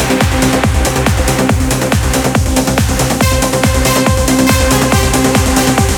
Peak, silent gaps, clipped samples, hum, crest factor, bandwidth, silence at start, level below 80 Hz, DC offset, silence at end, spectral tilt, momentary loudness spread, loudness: 0 dBFS; none; under 0.1%; none; 10 dB; 19.5 kHz; 0 s; -18 dBFS; under 0.1%; 0 s; -4.5 dB/octave; 2 LU; -11 LUFS